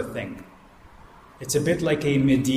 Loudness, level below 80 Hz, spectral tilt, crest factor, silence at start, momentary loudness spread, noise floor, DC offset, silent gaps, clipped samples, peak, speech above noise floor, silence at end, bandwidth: -23 LUFS; -50 dBFS; -5.5 dB/octave; 16 dB; 0 s; 18 LU; -49 dBFS; under 0.1%; none; under 0.1%; -8 dBFS; 26 dB; 0 s; 15.5 kHz